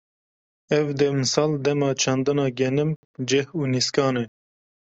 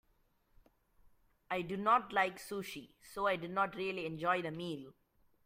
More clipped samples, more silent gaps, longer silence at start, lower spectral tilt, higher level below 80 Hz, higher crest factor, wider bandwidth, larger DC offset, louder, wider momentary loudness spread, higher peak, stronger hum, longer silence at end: neither; first, 2.96-3.14 s vs none; second, 0.7 s vs 1.5 s; about the same, -5 dB/octave vs -5 dB/octave; first, -64 dBFS vs -70 dBFS; about the same, 18 dB vs 22 dB; second, 8.2 kHz vs 16 kHz; neither; first, -23 LUFS vs -36 LUFS; second, 5 LU vs 14 LU; first, -6 dBFS vs -18 dBFS; neither; first, 0.7 s vs 0.55 s